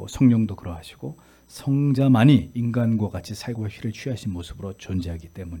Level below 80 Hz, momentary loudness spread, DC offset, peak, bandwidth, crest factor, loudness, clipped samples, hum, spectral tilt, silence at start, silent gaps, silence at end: -50 dBFS; 19 LU; under 0.1%; -4 dBFS; 17.5 kHz; 18 dB; -22 LUFS; under 0.1%; none; -7.5 dB/octave; 0 s; none; 0 s